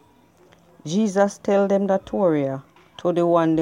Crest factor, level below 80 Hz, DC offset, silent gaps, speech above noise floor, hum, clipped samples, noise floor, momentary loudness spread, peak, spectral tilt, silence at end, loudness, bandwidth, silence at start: 16 dB; -60 dBFS; under 0.1%; none; 35 dB; none; under 0.1%; -55 dBFS; 9 LU; -4 dBFS; -6.5 dB/octave; 0 s; -21 LUFS; 11 kHz; 0.85 s